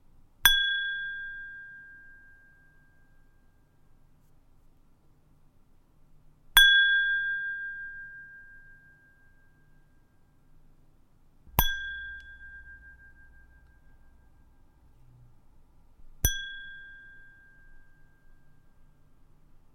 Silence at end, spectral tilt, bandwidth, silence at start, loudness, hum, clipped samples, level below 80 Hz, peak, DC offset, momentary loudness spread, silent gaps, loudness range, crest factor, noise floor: 2.55 s; 0 dB/octave; 16.5 kHz; 0.45 s; -25 LUFS; none; under 0.1%; -46 dBFS; -4 dBFS; under 0.1%; 29 LU; none; 20 LU; 30 dB; -60 dBFS